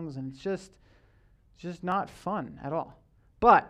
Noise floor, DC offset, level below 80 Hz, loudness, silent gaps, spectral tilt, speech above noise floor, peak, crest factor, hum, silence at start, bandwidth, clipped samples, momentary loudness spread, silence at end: -61 dBFS; under 0.1%; -56 dBFS; -31 LUFS; none; -7 dB/octave; 33 dB; -6 dBFS; 24 dB; none; 0 s; 12 kHz; under 0.1%; 15 LU; 0 s